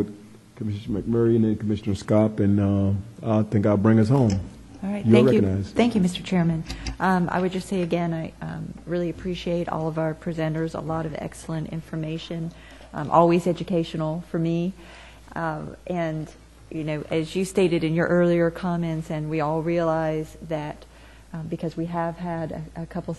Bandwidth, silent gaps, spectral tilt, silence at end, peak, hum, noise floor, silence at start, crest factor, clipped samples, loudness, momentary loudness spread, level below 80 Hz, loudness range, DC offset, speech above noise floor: 12 kHz; none; -7.5 dB/octave; 0 s; -2 dBFS; none; -45 dBFS; 0 s; 22 dB; under 0.1%; -24 LUFS; 14 LU; -48 dBFS; 8 LU; under 0.1%; 21 dB